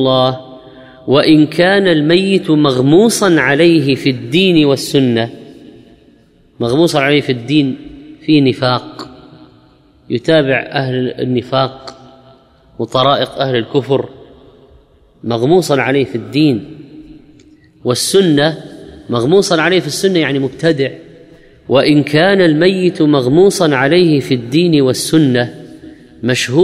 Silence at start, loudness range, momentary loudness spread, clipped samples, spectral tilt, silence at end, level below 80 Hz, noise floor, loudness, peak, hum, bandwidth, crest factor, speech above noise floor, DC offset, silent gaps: 0 s; 6 LU; 12 LU; under 0.1%; -5.5 dB/octave; 0 s; -50 dBFS; -48 dBFS; -12 LUFS; 0 dBFS; none; 15 kHz; 12 dB; 36 dB; under 0.1%; none